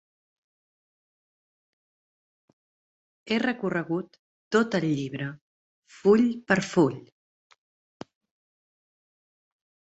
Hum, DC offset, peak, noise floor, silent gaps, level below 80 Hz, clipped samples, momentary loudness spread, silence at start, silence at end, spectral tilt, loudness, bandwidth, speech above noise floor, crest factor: none; under 0.1%; -6 dBFS; under -90 dBFS; 4.19-4.51 s, 5.41-5.83 s; -68 dBFS; under 0.1%; 13 LU; 3.25 s; 2.9 s; -6 dB/octave; -26 LUFS; 8.2 kHz; over 65 dB; 24 dB